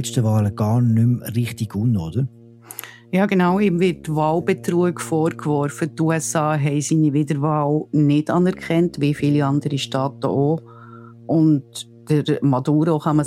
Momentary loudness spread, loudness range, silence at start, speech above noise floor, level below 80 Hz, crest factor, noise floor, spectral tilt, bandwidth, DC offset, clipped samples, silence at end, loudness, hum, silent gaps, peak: 7 LU; 2 LU; 0 s; 22 dB; -54 dBFS; 14 dB; -41 dBFS; -6.5 dB/octave; 15 kHz; under 0.1%; under 0.1%; 0 s; -20 LUFS; none; none; -6 dBFS